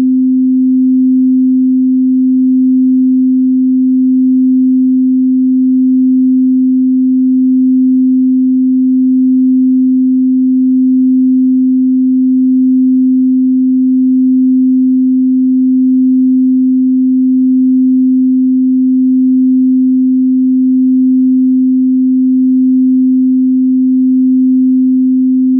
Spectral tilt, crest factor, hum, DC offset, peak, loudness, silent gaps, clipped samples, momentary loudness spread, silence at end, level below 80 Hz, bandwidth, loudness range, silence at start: -17.5 dB/octave; 4 dB; none; under 0.1%; -4 dBFS; -9 LUFS; none; under 0.1%; 1 LU; 0 s; -72 dBFS; 0.4 kHz; 0 LU; 0 s